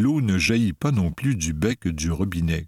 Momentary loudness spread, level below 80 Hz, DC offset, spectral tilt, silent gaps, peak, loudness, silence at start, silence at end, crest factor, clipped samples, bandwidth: 5 LU; -38 dBFS; under 0.1%; -5.5 dB/octave; none; -6 dBFS; -23 LUFS; 0 s; 0 s; 16 dB; under 0.1%; 16 kHz